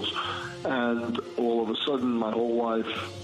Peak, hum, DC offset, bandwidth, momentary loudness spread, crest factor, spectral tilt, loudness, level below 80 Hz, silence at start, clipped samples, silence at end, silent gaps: -14 dBFS; none; under 0.1%; 10.5 kHz; 5 LU; 14 dB; -5.5 dB/octave; -28 LUFS; -68 dBFS; 0 s; under 0.1%; 0 s; none